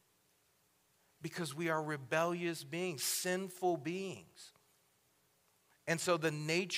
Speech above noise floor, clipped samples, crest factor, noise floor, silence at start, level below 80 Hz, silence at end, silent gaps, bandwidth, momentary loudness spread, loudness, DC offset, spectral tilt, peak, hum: 37 dB; under 0.1%; 22 dB; -74 dBFS; 1.2 s; -86 dBFS; 0 s; none; 16 kHz; 15 LU; -37 LUFS; under 0.1%; -4 dB/octave; -18 dBFS; none